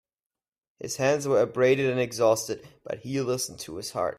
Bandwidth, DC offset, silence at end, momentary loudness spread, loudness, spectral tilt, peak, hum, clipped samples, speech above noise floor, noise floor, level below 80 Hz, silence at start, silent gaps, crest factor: 16 kHz; under 0.1%; 0.05 s; 14 LU; -26 LUFS; -4.5 dB/octave; -10 dBFS; none; under 0.1%; over 64 dB; under -90 dBFS; -66 dBFS; 0.8 s; none; 18 dB